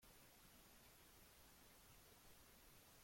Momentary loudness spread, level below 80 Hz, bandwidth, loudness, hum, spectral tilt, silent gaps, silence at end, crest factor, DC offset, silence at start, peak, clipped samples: 0 LU; -76 dBFS; 16.5 kHz; -67 LUFS; none; -2.5 dB/octave; none; 0 s; 14 dB; under 0.1%; 0 s; -54 dBFS; under 0.1%